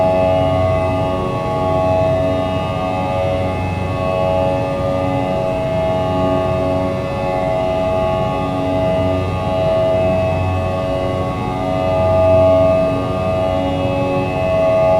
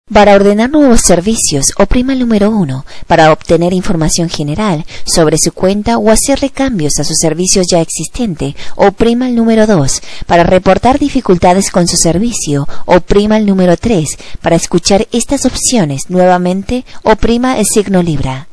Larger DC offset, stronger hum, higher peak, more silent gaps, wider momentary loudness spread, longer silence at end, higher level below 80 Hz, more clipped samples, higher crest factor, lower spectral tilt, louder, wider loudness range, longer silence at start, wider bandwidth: second, under 0.1% vs 3%; neither; about the same, -2 dBFS vs 0 dBFS; neither; second, 5 LU vs 8 LU; about the same, 0 s vs 0.1 s; second, -34 dBFS vs -24 dBFS; second, under 0.1% vs 1%; about the same, 14 dB vs 10 dB; first, -7.5 dB/octave vs -4.5 dB/octave; second, -17 LUFS vs -10 LUFS; about the same, 2 LU vs 2 LU; about the same, 0 s vs 0.05 s; first, 12.5 kHz vs 11 kHz